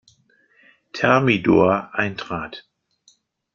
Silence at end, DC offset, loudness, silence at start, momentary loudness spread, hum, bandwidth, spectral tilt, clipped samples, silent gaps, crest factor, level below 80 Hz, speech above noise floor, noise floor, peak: 0.95 s; under 0.1%; -19 LUFS; 0.95 s; 19 LU; none; 7.2 kHz; -7 dB/octave; under 0.1%; none; 20 dB; -56 dBFS; 41 dB; -60 dBFS; -2 dBFS